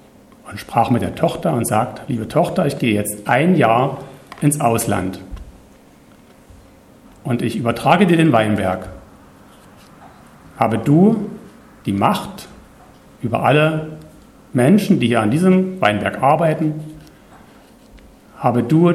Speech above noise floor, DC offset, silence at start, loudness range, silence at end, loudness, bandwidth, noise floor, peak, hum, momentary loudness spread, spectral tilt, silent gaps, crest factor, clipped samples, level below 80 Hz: 31 dB; under 0.1%; 0.45 s; 4 LU; 0 s; -17 LUFS; 15 kHz; -46 dBFS; 0 dBFS; none; 19 LU; -6.5 dB/octave; none; 18 dB; under 0.1%; -48 dBFS